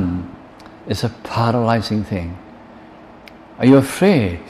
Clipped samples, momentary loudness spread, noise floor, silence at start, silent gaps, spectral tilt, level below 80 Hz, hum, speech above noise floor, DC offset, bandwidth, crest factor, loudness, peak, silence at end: under 0.1%; 19 LU; -41 dBFS; 0 s; none; -7 dB/octave; -44 dBFS; none; 25 dB; under 0.1%; 14 kHz; 16 dB; -17 LUFS; -2 dBFS; 0 s